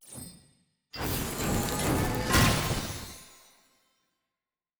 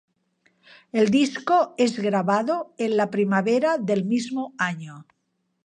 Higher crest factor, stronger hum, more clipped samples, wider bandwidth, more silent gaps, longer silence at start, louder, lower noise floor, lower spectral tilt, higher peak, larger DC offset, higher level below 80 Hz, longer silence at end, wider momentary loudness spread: about the same, 20 dB vs 16 dB; neither; neither; first, over 20 kHz vs 10 kHz; neither; second, 0.05 s vs 0.95 s; second, -28 LUFS vs -23 LUFS; first, under -90 dBFS vs -74 dBFS; second, -4 dB/octave vs -5.5 dB/octave; second, -12 dBFS vs -8 dBFS; neither; first, -42 dBFS vs -70 dBFS; first, 1.5 s vs 0.65 s; first, 21 LU vs 7 LU